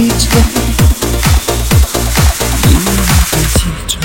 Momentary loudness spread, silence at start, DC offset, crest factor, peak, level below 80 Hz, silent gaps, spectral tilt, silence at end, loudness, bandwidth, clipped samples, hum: 3 LU; 0 s; under 0.1%; 10 dB; 0 dBFS; -14 dBFS; none; -4 dB/octave; 0 s; -11 LUFS; 17 kHz; 0.2%; none